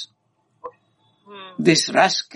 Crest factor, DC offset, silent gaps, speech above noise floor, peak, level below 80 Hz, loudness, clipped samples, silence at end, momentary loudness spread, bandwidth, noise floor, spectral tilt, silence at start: 22 dB; under 0.1%; none; 48 dB; -2 dBFS; -68 dBFS; -17 LUFS; under 0.1%; 0.1 s; 25 LU; 11.5 kHz; -67 dBFS; -3.5 dB/octave; 0 s